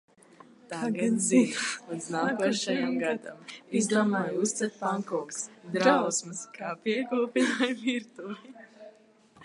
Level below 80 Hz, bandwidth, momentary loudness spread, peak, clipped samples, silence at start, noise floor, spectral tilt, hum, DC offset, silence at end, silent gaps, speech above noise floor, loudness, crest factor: -82 dBFS; 11.5 kHz; 16 LU; -8 dBFS; under 0.1%; 0.7 s; -59 dBFS; -4 dB/octave; none; under 0.1%; 0 s; none; 30 dB; -28 LUFS; 22 dB